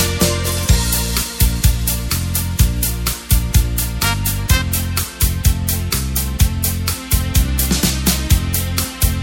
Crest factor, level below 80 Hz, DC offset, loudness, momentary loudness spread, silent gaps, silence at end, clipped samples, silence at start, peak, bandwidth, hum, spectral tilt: 16 dB; -20 dBFS; under 0.1%; -17 LUFS; 4 LU; none; 0 s; under 0.1%; 0 s; 0 dBFS; 17 kHz; none; -3.5 dB/octave